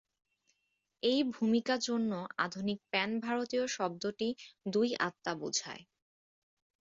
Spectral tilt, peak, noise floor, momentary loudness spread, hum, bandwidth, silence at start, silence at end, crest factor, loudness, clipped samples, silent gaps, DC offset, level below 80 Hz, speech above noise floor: -3.5 dB/octave; -16 dBFS; -82 dBFS; 7 LU; none; 7.8 kHz; 1.05 s; 1 s; 18 dB; -34 LUFS; under 0.1%; none; under 0.1%; -78 dBFS; 48 dB